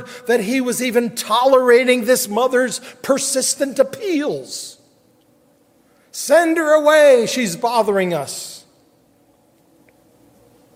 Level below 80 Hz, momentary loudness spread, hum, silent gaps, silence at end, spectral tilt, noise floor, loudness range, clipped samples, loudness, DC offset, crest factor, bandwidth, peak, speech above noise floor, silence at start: -68 dBFS; 15 LU; none; none; 2.15 s; -3 dB/octave; -56 dBFS; 6 LU; under 0.1%; -16 LUFS; under 0.1%; 16 dB; 16 kHz; -2 dBFS; 40 dB; 0 s